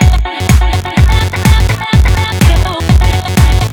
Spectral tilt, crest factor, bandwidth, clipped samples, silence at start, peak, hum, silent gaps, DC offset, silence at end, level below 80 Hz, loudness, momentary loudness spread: -5.5 dB/octave; 8 dB; 19 kHz; 0.4%; 0 s; 0 dBFS; none; none; under 0.1%; 0 s; -12 dBFS; -10 LUFS; 2 LU